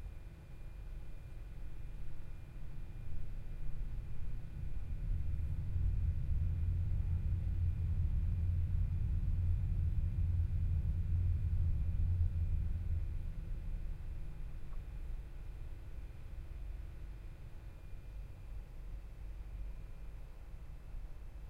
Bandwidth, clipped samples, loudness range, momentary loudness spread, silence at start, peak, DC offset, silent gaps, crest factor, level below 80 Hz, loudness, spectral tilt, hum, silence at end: 4.2 kHz; under 0.1%; 14 LU; 16 LU; 0 s; -22 dBFS; under 0.1%; none; 14 dB; -40 dBFS; -40 LUFS; -9 dB/octave; none; 0 s